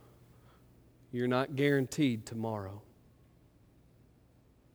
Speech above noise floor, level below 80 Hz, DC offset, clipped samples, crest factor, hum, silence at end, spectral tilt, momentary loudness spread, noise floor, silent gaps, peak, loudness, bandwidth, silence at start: 32 dB; -68 dBFS; under 0.1%; under 0.1%; 20 dB; none; 1.95 s; -6 dB/octave; 14 LU; -64 dBFS; none; -16 dBFS; -33 LUFS; over 20 kHz; 1.15 s